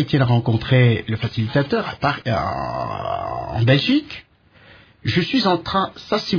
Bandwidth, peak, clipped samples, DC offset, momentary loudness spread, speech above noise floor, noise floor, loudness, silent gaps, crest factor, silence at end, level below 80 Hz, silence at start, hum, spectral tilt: 5.4 kHz; -2 dBFS; under 0.1%; under 0.1%; 10 LU; 30 dB; -49 dBFS; -20 LUFS; none; 18 dB; 0 s; -46 dBFS; 0 s; none; -7.5 dB/octave